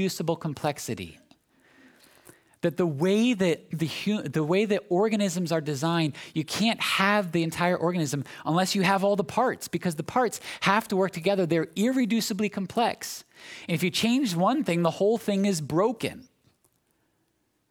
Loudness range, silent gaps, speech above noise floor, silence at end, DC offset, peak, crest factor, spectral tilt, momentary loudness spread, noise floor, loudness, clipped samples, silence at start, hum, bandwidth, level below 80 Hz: 3 LU; none; 47 dB; 1.5 s; under 0.1%; -6 dBFS; 20 dB; -5 dB/octave; 8 LU; -73 dBFS; -26 LUFS; under 0.1%; 0 s; none; 18.5 kHz; -66 dBFS